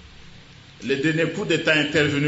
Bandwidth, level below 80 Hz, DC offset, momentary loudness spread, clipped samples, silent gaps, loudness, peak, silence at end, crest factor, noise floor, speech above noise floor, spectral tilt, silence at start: 8 kHz; -54 dBFS; under 0.1%; 7 LU; under 0.1%; none; -21 LUFS; -6 dBFS; 0 s; 18 dB; -46 dBFS; 25 dB; -5 dB/octave; 0.05 s